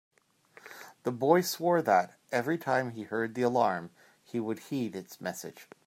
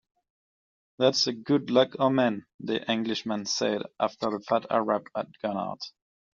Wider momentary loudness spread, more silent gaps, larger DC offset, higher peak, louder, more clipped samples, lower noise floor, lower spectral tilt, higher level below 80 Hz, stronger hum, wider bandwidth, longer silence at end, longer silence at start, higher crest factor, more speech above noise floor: first, 17 LU vs 10 LU; second, none vs 2.54-2.59 s; neither; about the same, -10 dBFS vs -8 dBFS; second, -30 LUFS vs -27 LUFS; neither; second, -60 dBFS vs under -90 dBFS; first, -5 dB/octave vs -3.5 dB/octave; second, -80 dBFS vs -72 dBFS; neither; first, 16 kHz vs 7.4 kHz; second, 0.25 s vs 0.45 s; second, 0.65 s vs 1 s; about the same, 22 dB vs 22 dB; second, 31 dB vs over 63 dB